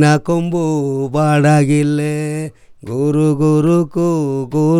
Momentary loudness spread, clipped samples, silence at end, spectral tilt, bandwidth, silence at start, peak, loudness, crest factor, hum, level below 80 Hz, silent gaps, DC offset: 9 LU; under 0.1%; 0 s; -7.5 dB/octave; 12 kHz; 0 s; -2 dBFS; -15 LUFS; 14 dB; none; -50 dBFS; none; under 0.1%